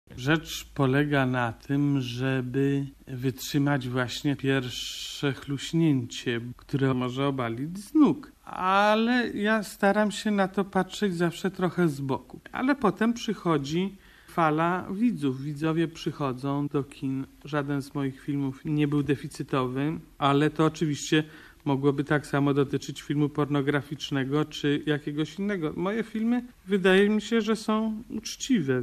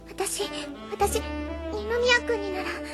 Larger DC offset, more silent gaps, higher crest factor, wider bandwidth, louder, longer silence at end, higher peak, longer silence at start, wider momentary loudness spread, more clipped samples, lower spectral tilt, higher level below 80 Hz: neither; neither; about the same, 18 dB vs 20 dB; about the same, 14 kHz vs 13 kHz; about the same, -27 LUFS vs -27 LUFS; about the same, 0 s vs 0 s; about the same, -8 dBFS vs -8 dBFS; about the same, 0.1 s vs 0 s; second, 9 LU vs 12 LU; neither; first, -6 dB/octave vs -3 dB/octave; second, -56 dBFS vs -42 dBFS